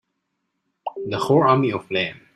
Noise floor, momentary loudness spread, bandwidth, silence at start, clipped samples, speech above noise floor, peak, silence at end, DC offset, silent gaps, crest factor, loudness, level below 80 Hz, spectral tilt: -76 dBFS; 17 LU; 14 kHz; 0.85 s; under 0.1%; 56 dB; -4 dBFS; 0.25 s; under 0.1%; none; 18 dB; -20 LUFS; -64 dBFS; -6.5 dB/octave